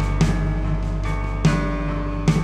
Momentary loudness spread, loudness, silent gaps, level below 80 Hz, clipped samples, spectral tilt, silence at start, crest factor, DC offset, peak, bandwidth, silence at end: 5 LU; -23 LUFS; none; -24 dBFS; under 0.1%; -7 dB/octave; 0 s; 16 dB; under 0.1%; -4 dBFS; 10.5 kHz; 0 s